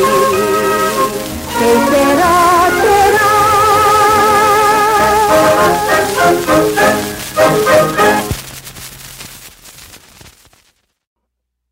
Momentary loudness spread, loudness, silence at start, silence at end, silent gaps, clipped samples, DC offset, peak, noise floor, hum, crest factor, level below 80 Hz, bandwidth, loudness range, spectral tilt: 14 LU; -10 LUFS; 0 s; 1.85 s; none; under 0.1%; under 0.1%; 0 dBFS; -73 dBFS; none; 12 dB; -38 dBFS; 16.5 kHz; 7 LU; -3.5 dB/octave